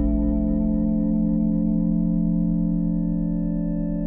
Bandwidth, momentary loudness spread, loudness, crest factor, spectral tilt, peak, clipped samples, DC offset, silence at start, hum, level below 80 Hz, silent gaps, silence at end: 1.9 kHz; 3 LU; -23 LUFS; 10 dB; -15 dB/octave; -12 dBFS; under 0.1%; under 0.1%; 0 s; none; -30 dBFS; none; 0 s